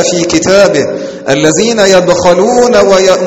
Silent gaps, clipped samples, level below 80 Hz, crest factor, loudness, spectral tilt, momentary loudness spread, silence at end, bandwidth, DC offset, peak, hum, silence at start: none; 2%; -38 dBFS; 8 dB; -7 LUFS; -3.5 dB/octave; 7 LU; 0 s; 14 kHz; under 0.1%; 0 dBFS; none; 0 s